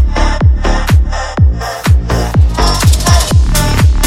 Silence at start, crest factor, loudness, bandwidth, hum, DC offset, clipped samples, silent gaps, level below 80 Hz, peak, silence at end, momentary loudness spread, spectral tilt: 0 s; 8 dB; -11 LUFS; 16.5 kHz; none; under 0.1%; 0.8%; none; -12 dBFS; 0 dBFS; 0 s; 4 LU; -5 dB/octave